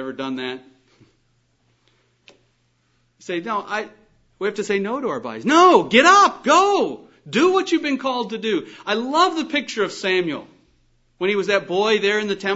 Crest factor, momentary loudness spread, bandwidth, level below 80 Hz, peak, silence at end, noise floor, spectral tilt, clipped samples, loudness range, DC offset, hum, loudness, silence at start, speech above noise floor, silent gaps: 20 dB; 15 LU; 8 kHz; -66 dBFS; -2 dBFS; 0 s; -64 dBFS; -3.5 dB/octave; under 0.1%; 16 LU; under 0.1%; none; -19 LUFS; 0 s; 46 dB; none